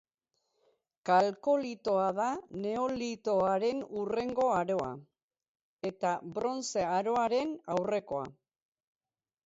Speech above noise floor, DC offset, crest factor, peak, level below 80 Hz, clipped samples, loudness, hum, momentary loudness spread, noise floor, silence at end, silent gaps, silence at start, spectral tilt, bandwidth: 51 dB; under 0.1%; 20 dB; -14 dBFS; -70 dBFS; under 0.1%; -32 LUFS; none; 10 LU; -82 dBFS; 1.15 s; 5.23-5.29 s, 5.48-5.55 s, 5.61-5.79 s; 1.05 s; -5 dB/octave; 8 kHz